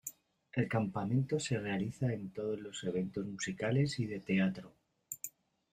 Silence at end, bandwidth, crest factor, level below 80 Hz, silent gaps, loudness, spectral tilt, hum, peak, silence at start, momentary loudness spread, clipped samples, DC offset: 0.45 s; 15.5 kHz; 18 dB; -68 dBFS; none; -36 LUFS; -6 dB/octave; none; -20 dBFS; 0.05 s; 11 LU; under 0.1%; under 0.1%